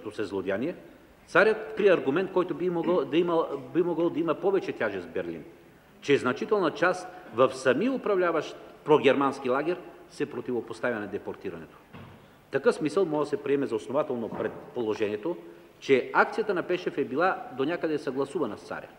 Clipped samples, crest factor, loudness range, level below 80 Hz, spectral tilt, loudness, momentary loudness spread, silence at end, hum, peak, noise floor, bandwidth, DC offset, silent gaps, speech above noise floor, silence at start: under 0.1%; 20 dB; 4 LU; -68 dBFS; -6 dB/octave; -27 LUFS; 13 LU; 0.1 s; none; -6 dBFS; -50 dBFS; 15 kHz; under 0.1%; none; 23 dB; 0 s